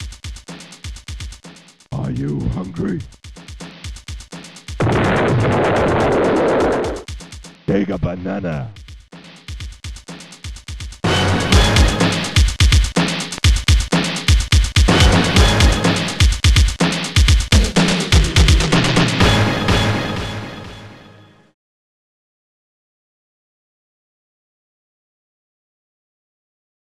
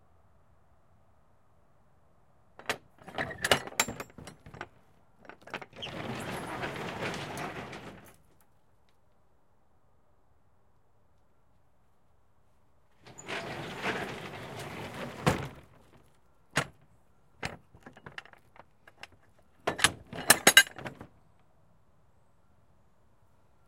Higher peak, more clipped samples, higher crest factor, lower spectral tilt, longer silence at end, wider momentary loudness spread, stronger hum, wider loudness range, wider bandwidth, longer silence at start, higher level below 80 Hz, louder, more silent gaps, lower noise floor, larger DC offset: about the same, 0 dBFS vs -2 dBFS; neither; second, 16 dB vs 34 dB; first, -4.5 dB/octave vs -1.5 dB/octave; first, 5.95 s vs 2.6 s; second, 20 LU vs 23 LU; neither; second, 12 LU vs 17 LU; second, 14 kHz vs 16.5 kHz; second, 0 s vs 2.6 s; first, -22 dBFS vs -62 dBFS; first, -16 LUFS vs -30 LUFS; neither; second, -45 dBFS vs -70 dBFS; neither